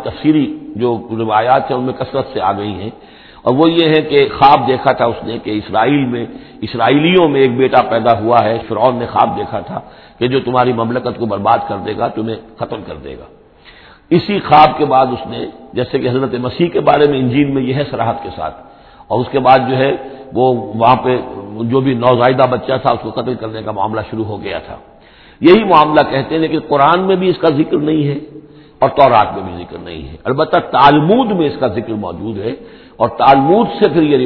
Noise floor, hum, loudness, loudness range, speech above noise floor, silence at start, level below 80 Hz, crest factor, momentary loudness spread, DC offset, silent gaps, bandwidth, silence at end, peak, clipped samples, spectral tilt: -42 dBFS; none; -13 LUFS; 4 LU; 29 dB; 0 s; -44 dBFS; 14 dB; 15 LU; under 0.1%; none; 5.4 kHz; 0 s; 0 dBFS; 0.2%; -9.5 dB/octave